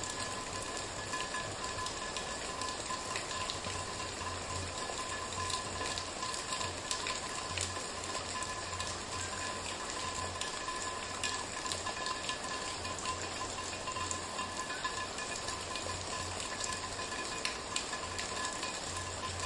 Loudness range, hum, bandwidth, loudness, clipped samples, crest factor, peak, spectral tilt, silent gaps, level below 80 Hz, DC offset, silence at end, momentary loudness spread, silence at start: 1 LU; none; 11.5 kHz; -37 LUFS; under 0.1%; 26 dB; -14 dBFS; -2 dB/octave; none; -58 dBFS; under 0.1%; 0 s; 2 LU; 0 s